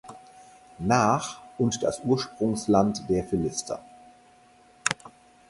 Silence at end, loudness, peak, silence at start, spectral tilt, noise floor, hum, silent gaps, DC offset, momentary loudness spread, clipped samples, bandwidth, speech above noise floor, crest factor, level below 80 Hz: 0.4 s; -26 LUFS; -2 dBFS; 0.05 s; -5 dB/octave; -56 dBFS; none; none; under 0.1%; 13 LU; under 0.1%; 11.5 kHz; 31 dB; 26 dB; -54 dBFS